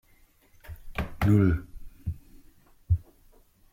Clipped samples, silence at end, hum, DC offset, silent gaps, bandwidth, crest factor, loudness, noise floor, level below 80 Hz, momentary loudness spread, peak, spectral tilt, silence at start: under 0.1%; 0.75 s; none; under 0.1%; none; 15.5 kHz; 20 dB; -28 LUFS; -60 dBFS; -42 dBFS; 25 LU; -10 dBFS; -8.5 dB/octave; 0.7 s